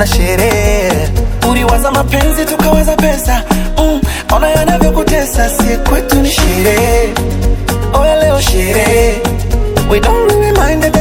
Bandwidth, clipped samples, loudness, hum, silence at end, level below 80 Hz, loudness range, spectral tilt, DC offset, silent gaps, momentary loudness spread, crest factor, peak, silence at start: 19 kHz; 0.4%; -11 LUFS; none; 0 s; -14 dBFS; 1 LU; -5 dB/octave; under 0.1%; none; 5 LU; 10 dB; 0 dBFS; 0 s